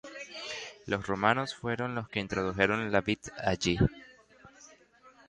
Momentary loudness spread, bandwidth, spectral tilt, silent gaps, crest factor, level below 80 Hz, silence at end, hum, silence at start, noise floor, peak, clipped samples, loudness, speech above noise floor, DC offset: 11 LU; 10.5 kHz; -5 dB/octave; none; 24 dB; -52 dBFS; 0.2 s; none; 0.05 s; -59 dBFS; -8 dBFS; under 0.1%; -31 LUFS; 29 dB; under 0.1%